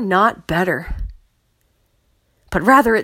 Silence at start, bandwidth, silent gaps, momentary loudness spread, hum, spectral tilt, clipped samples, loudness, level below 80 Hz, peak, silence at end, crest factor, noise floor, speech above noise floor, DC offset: 0 s; 16.5 kHz; none; 19 LU; none; -6 dB/octave; under 0.1%; -17 LUFS; -34 dBFS; 0 dBFS; 0 s; 18 dB; -63 dBFS; 47 dB; under 0.1%